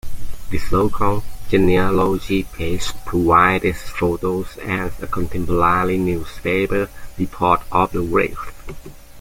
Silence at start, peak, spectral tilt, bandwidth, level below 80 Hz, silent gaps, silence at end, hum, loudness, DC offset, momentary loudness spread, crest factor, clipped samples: 0.05 s; -2 dBFS; -6.5 dB/octave; 16.5 kHz; -32 dBFS; none; 0 s; none; -19 LUFS; under 0.1%; 13 LU; 16 dB; under 0.1%